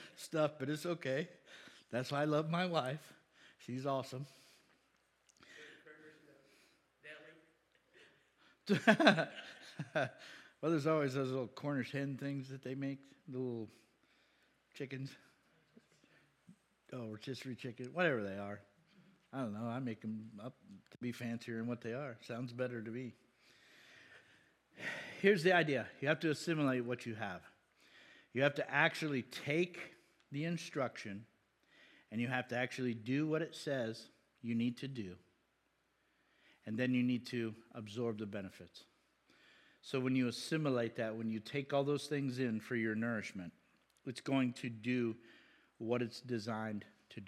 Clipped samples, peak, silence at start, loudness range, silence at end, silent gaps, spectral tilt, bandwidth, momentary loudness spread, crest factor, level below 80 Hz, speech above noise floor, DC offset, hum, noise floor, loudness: under 0.1%; -10 dBFS; 0 s; 12 LU; 0 s; none; -6 dB/octave; 14 kHz; 18 LU; 30 dB; -88 dBFS; 41 dB; under 0.1%; none; -79 dBFS; -39 LUFS